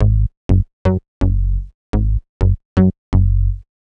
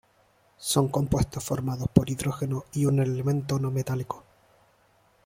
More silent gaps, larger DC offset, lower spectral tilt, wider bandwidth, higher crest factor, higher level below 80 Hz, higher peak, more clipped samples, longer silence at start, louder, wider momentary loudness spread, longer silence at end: first, 0.37-0.49 s, 0.73-0.85 s, 1.08-1.21 s, 1.74-1.93 s, 2.29-2.40 s, 2.65-2.76 s, 2.98-3.12 s vs none; neither; first, -10 dB/octave vs -6 dB/octave; second, 4.6 kHz vs 16.5 kHz; second, 14 dB vs 24 dB; first, -20 dBFS vs -48 dBFS; about the same, -2 dBFS vs -2 dBFS; neither; second, 0 s vs 0.6 s; first, -18 LUFS vs -27 LUFS; about the same, 7 LU vs 7 LU; second, 0.2 s vs 1.05 s